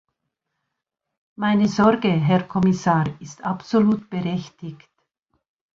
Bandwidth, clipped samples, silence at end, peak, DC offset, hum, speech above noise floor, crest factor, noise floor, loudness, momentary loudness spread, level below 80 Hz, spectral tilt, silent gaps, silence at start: 7.4 kHz; under 0.1%; 1 s; -4 dBFS; under 0.1%; none; 61 dB; 18 dB; -81 dBFS; -21 LUFS; 13 LU; -56 dBFS; -7 dB/octave; none; 1.4 s